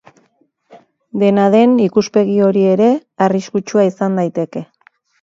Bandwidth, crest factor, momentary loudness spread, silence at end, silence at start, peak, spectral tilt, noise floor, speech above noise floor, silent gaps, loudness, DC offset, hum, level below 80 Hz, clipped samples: 7.6 kHz; 14 dB; 9 LU; 0.6 s; 0.75 s; 0 dBFS; -7 dB/octave; -59 dBFS; 46 dB; none; -14 LUFS; under 0.1%; none; -62 dBFS; under 0.1%